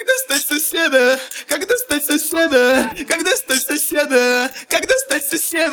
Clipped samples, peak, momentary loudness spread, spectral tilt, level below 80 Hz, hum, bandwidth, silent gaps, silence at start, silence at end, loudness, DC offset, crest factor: under 0.1%; -2 dBFS; 5 LU; -0.5 dB/octave; -54 dBFS; none; over 20 kHz; none; 0 s; 0 s; -16 LUFS; under 0.1%; 14 dB